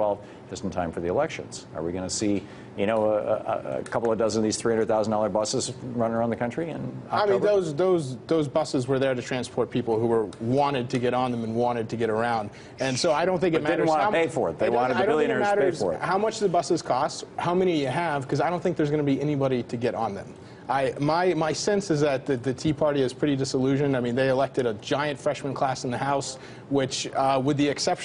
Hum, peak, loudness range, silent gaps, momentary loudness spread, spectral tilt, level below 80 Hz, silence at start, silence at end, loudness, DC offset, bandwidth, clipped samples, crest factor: none; -10 dBFS; 3 LU; none; 7 LU; -5.5 dB/octave; -58 dBFS; 0 s; 0 s; -25 LUFS; under 0.1%; 11 kHz; under 0.1%; 14 dB